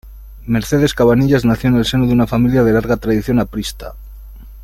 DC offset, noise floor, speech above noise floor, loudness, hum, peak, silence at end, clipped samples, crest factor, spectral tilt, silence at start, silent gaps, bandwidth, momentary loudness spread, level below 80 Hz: under 0.1%; -34 dBFS; 20 dB; -14 LUFS; none; -2 dBFS; 0 s; under 0.1%; 14 dB; -6.5 dB/octave; 0.05 s; none; 16 kHz; 12 LU; -32 dBFS